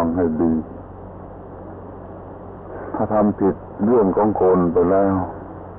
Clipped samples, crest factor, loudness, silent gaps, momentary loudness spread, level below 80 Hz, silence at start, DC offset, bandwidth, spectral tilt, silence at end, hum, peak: under 0.1%; 14 dB; -19 LUFS; none; 20 LU; -42 dBFS; 0 s; under 0.1%; 3.2 kHz; -13.5 dB/octave; 0 s; none; -6 dBFS